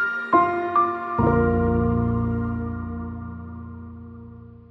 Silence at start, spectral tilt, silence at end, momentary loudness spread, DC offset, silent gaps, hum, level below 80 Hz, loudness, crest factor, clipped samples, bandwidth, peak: 0 s; -10.5 dB/octave; 0.15 s; 20 LU; under 0.1%; none; none; -38 dBFS; -22 LUFS; 18 dB; under 0.1%; 5.8 kHz; -6 dBFS